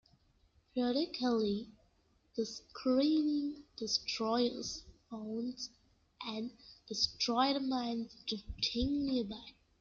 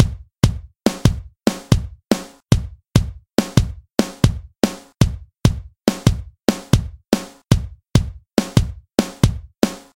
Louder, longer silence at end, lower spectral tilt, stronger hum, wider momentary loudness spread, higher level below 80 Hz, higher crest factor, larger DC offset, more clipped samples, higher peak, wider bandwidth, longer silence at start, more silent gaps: second, -36 LUFS vs -21 LUFS; first, 0.3 s vs 0.15 s; second, -4 dB/octave vs -6 dB/octave; neither; first, 14 LU vs 4 LU; second, -58 dBFS vs -28 dBFS; about the same, 20 dB vs 20 dB; neither; neither; second, -18 dBFS vs 0 dBFS; second, 7.6 kHz vs 17 kHz; first, 0.75 s vs 0 s; neither